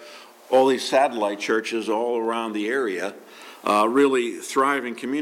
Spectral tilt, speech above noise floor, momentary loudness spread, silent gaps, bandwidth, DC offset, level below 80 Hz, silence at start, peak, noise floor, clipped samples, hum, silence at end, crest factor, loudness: -3.5 dB/octave; 22 dB; 11 LU; none; 16.5 kHz; under 0.1%; -82 dBFS; 0 s; -6 dBFS; -44 dBFS; under 0.1%; none; 0 s; 16 dB; -22 LUFS